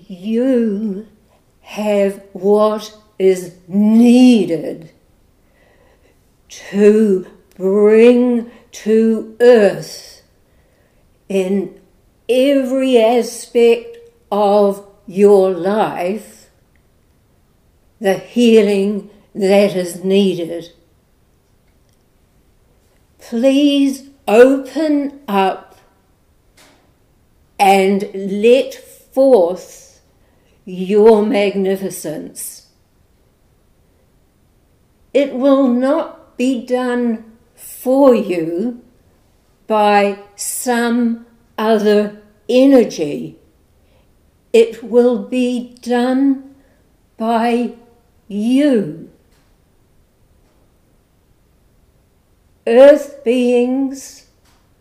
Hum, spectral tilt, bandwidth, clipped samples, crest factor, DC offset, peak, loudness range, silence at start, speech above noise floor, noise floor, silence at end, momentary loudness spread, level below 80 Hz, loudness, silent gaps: none; -5.5 dB/octave; 15.5 kHz; under 0.1%; 16 dB; under 0.1%; 0 dBFS; 6 LU; 0.1 s; 42 dB; -55 dBFS; 0.7 s; 16 LU; -58 dBFS; -14 LUFS; none